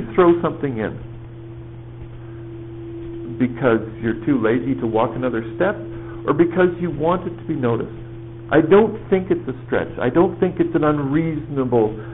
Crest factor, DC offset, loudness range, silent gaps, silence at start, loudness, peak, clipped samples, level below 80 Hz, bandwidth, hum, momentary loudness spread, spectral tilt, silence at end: 16 dB; 0.4%; 7 LU; none; 0 s; -19 LUFS; -4 dBFS; under 0.1%; -44 dBFS; 3.9 kHz; none; 19 LU; -7 dB/octave; 0 s